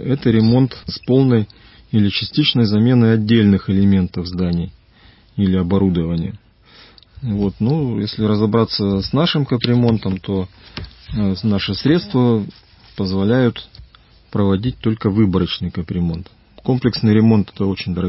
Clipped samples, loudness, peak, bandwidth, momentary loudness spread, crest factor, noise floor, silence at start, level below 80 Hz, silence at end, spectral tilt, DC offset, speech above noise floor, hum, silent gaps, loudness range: under 0.1%; -17 LUFS; -2 dBFS; 5.8 kHz; 12 LU; 16 dB; -48 dBFS; 0 s; -38 dBFS; 0 s; -11 dB/octave; under 0.1%; 32 dB; none; none; 5 LU